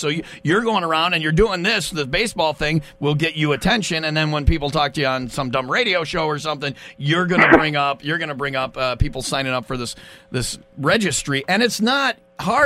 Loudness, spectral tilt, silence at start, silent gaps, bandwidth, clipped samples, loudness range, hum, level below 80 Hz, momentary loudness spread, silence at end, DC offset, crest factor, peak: -19 LUFS; -4.5 dB/octave; 0 s; none; 15.5 kHz; under 0.1%; 4 LU; none; -34 dBFS; 8 LU; 0 s; under 0.1%; 20 dB; 0 dBFS